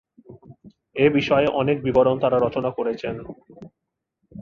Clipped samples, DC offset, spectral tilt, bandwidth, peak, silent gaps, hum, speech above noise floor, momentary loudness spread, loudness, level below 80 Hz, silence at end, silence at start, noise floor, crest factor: under 0.1%; under 0.1%; -7.5 dB/octave; 6.8 kHz; -4 dBFS; none; none; 61 dB; 16 LU; -21 LUFS; -52 dBFS; 0 s; 0.3 s; -81 dBFS; 18 dB